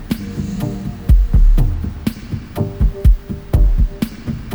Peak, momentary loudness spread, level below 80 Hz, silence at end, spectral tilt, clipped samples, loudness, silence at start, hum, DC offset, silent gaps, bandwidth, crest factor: -2 dBFS; 9 LU; -16 dBFS; 0 s; -8 dB/octave; under 0.1%; -19 LUFS; 0 s; none; under 0.1%; none; over 20 kHz; 14 dB